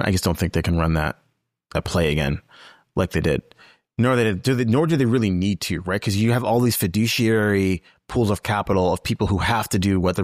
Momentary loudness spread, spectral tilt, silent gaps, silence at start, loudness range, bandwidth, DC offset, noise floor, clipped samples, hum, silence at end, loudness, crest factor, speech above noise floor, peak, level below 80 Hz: 8 LU; -6 dB/octave; none; 0 s; 4 LU; 15.5 kHz; 0.2%; -54 dBFS; under 0.1%; none; 0 s; -21 LUFS; 12 dB; 34 dB; -8 dBFS; -38 dBFS